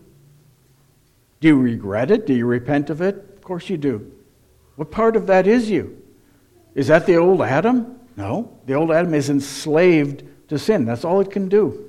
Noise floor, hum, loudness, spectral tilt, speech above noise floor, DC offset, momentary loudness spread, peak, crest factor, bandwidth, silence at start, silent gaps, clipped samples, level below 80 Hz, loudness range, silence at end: -58 dBFS; none; -18 LUFS; -7 dB/octave; 40 dB; under 0.1%; 15 LU; 0 dBFS; 18 dB; 13.5 kHz; 1.4 s; none; under 0.1%; -54 dBFS; 3 LU; 0 s